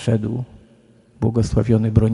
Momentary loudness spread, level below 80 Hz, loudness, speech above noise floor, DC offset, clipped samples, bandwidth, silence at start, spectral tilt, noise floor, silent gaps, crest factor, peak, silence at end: 12 LU; -34 dBFS; -20 LUFS; 34 dB; under 0.1%; under 0.1%; 11 kHz; 0 s; -8.5 dB/octave; -52 dBFS; none; 20 dB; 0 dBFS; 0 s